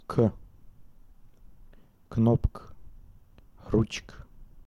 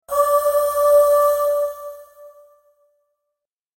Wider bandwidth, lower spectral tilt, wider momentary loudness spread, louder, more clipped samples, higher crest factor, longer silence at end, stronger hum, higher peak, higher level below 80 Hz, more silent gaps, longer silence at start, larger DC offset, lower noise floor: second, 10.5 kHz vs 16.5 kHz; first, -7.5 dB/octave vs -0.5 dB/octave; first, 26 LU vs 14 LU; second, -28 LUFS vs -17 LUFS; neither; first, 20 dB vs 14 dB; second, 0.05 s vs 1.5 s; neither; second, -12 dBFS vs -6 dBFS; first, -42 dBFS vs -58 dBFS; neither; about the same, 0.1 s vs 0.1 s; neither; second, -54 dBFS vs -82 dBFS